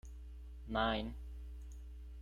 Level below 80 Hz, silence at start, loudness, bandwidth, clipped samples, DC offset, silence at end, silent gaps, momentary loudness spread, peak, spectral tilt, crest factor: -48 dBFS; 0.05 s; -41 LUFS; 10.5 kHz; under 0.1%; under 0.1%; 0 s; none; 17 LU; -22 dBFS; -6 dB/octave; 20 dB